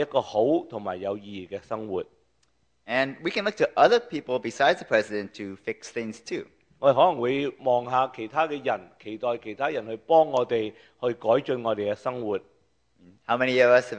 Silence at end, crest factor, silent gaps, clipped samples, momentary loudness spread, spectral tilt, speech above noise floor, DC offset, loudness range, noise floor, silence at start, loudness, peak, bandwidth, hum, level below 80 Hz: 0 s; 20 dB; none; under 0.1%; 14 LU; -5 dB/octave; 45 dB; under 0.1%; 3 LU; -70 dBFS; 0 s; -26 LUFS; -4 dBFS; 9.4 kHz; none; -68 dBFS